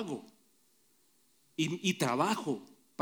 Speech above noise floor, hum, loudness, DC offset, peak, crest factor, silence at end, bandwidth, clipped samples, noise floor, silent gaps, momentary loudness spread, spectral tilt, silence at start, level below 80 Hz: 37 dB; none; -34 LUFS; under 0.1%; -16 dBFS; 20 dB; 0.35 s; over 20 kHz; under 0.1%; -70 dBFS; none; 14 LU; -4.5 dB/octave; 0 s; -82 dBFS